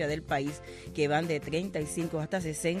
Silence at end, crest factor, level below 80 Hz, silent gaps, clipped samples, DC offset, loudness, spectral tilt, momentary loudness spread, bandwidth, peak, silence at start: 0 s; 16 dB; -54 dBFS; none; under 0.1%; under 0.1%; -32 LUFS; -5 dB/octave; 7 LU; 14.5 kHz; -16 dBFS; 0 s